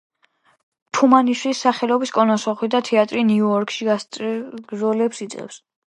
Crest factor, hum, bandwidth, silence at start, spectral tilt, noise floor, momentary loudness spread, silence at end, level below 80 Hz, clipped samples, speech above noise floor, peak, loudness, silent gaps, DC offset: 20 dB; none; 11 kHz; 0.95 s; -5 dB/octave; -61 dBFS; 14 LU; 0.45 s; -72 dBFS; under 0.1%; 42 dB; 0 dBFS; -19 LUFS; none; under 0.1%